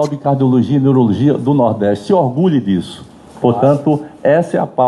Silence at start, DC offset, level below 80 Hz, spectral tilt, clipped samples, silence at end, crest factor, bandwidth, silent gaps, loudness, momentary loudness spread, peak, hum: 0 s; under 0.1%; -52 dBFS; -8.5 dB/octave; under 0.1%; 0 s; 12 dB; 11.5 kHz; none; -14 LUFS; 6 LU; 0 dBFS; none